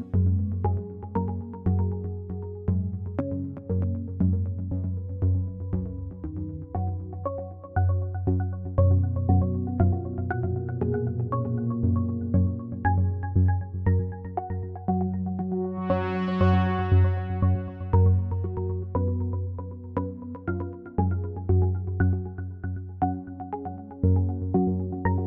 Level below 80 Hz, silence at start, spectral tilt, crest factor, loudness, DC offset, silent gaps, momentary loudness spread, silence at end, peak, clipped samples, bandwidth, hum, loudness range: -42 dBFS; 0 s; -11.5 dB/octave; 18 dB; -27 LUFS; under 0.1%; none; 11 LU; 0 s; -8 dBFS; under 0.1%; 3.7 kHz; none; 5 LU